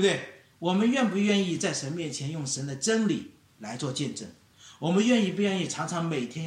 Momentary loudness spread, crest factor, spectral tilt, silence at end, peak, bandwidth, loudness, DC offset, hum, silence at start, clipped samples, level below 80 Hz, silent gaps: 12 LU; 16 dB; -4.5 dB/octave; 0 s; -12 dBFS; 11 kHz; -28 LUFS; under 0.1%; none; 0 s; under 0.1%; -72 dBFS; none